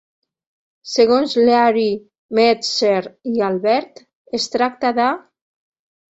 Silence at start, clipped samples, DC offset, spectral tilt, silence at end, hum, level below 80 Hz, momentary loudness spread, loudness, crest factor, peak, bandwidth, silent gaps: 0.85 s; under 0.1%; under 0.1%; -4 dB/octave; 0.95 s; none; -62 dBFS; 9 LU; -17 LUFS; 16 dB; -2 dBFS; 8 kHz; 2.18-2.29 s, 4.15-4.25 s